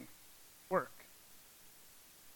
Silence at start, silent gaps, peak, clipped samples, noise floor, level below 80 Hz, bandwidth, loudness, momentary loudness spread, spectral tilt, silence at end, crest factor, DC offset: 0 s; none; -20 dBFS; under 0.1%; -60 dBFS; -78 dBFS; 17.5 kHz; -39 LUFS; 20 LU; -4.5 dB/octave; 0 s; 26 dB; under 0.1%